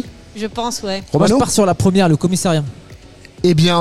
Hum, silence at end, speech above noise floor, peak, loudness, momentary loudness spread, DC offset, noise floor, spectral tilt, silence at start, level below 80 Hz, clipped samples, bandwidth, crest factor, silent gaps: none; 0 s; 25 dB; -4 dBFS; -15 LUFS; 12 LU; 1%; -39 dBFS; -5.5 dB/octave; 0 s; -42 dBFS; under 0.1%; 14.5 kHz; 12 dB; none